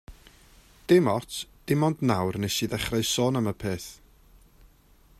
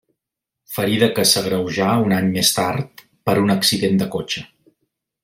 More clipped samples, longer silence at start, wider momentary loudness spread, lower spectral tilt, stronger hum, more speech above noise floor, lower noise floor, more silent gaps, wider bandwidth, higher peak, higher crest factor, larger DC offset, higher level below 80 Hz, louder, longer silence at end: neither; second, 0.1 s vs 0.7 s; about the same, 14 LU vs 12 LU; about the same, -5 dB/octave vs -4 dB/octave; neither; second, 32 dB vs 66 dB; second, -58 dBFS vs -84 dBFS; neither; about the same, 15.5 kHz vs 16.5 kHz; second, -8 dBFS vs -2 dBFS; about the same, 20 dB vs 18 dB; neither; about the same, -52 dBFS vs -56 dBFS; second, -26 LUFS vs -18 LUFS; first, 1.25 s vs 0.8 s